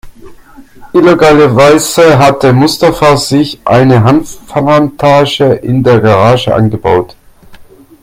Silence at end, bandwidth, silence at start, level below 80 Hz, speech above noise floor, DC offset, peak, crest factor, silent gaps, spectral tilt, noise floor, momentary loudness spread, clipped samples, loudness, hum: 0.4 s; 16.5 kHz; 0.05 s; -36 dBFS; 27 dB; under 0.1%; 0 dBFS; 8 dB; none; -6 dB/octave; -34 dBFS; 6 LU; 1%; -7 LUFS; none